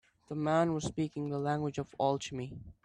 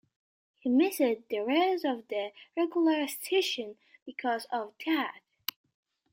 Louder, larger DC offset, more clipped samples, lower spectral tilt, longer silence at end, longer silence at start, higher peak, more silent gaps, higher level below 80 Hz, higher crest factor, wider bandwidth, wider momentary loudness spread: second, -34 LUFS vs -30 LUFS; neither; neither; first, -6 dB/octave vs -2.5 dB/octave; second, 0.1 s vs 1 s; second, 0.3 s vs 0.65 s; second, -16 dBFS vs -10 dBFS; second, none vs 4.02-4.06 s; first, -62 dBFS vs -80 dBFS; about the same, 18 dB vs 20 dB; second, 11 kHz vs 16.5 kHz; about the same, 12 LU vs 12 LU